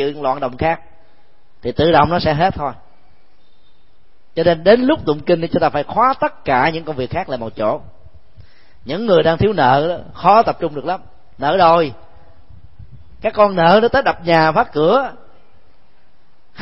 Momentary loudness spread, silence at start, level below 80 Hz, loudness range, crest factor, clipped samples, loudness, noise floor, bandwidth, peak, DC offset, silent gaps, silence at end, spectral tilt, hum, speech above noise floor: 12 LU; 0 s; -44 dBFS; 4 LU; 18 dB; under 0.1%; -16 LUFS; -56 dBFS; 5.8 kHz; 0 dBFS; 2%; none; 1.5 s; -9 dB/octave; none; 41 dB